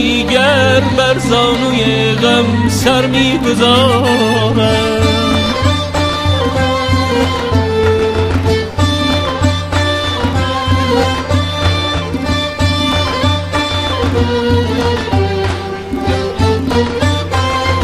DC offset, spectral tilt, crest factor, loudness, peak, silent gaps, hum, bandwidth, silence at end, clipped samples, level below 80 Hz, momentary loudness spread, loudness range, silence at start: under 0.1%; -5.5 dB/octave; 12 dB; -13 LUFS; 0 dBFS; none; none; 15 kHz; 0 s; under 0.1%; -28 dBFS; 4 LU; 4 LU; 0 s